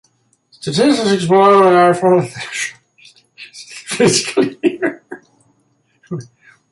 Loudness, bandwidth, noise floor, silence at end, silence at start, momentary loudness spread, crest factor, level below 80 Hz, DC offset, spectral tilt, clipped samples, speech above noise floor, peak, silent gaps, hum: -14 LUFS; 11.5 kHz; -60 dBFS; 0.45 s; 0.65 s; 23 LU; 14 dB; -58 dBFS; under 0.1%; -4.5 dB/octave; under 0.1%; 48 dB; -2 dBFS; none; none